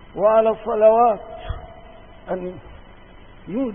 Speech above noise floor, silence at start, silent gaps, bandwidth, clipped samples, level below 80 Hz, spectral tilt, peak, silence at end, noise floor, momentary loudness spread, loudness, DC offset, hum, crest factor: 26 dB; 0.15 s; none; 3.6 kHz; under 0.1%; -42 dBFS; -11 dB/octave; -4 dBFS; 0 s; -44 dBFS; 20 LU; -19 LUFS; 0.3%; none; 18 dB